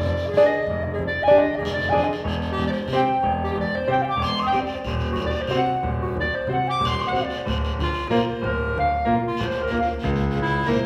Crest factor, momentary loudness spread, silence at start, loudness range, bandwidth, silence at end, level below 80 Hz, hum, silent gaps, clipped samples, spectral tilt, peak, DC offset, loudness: 18 dB; 7 LU; 0 s; 2 LU; 10 kHz; 0 s; -34 dBFS; none; none; under 0.1%; -7 dB/octave; -4 dBFS; under 0.1%; -23 LUFS